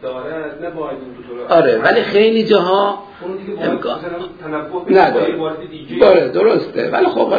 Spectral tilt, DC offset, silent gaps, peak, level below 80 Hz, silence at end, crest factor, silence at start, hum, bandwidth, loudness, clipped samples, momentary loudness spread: -7.5 dB/octave; under 0.1%; none; 0 dBFS; -52 dBFS; 0 s; 16 dB; 0 s; none; 5 kHz; -15 LUFS; under 0.1%; 16 LU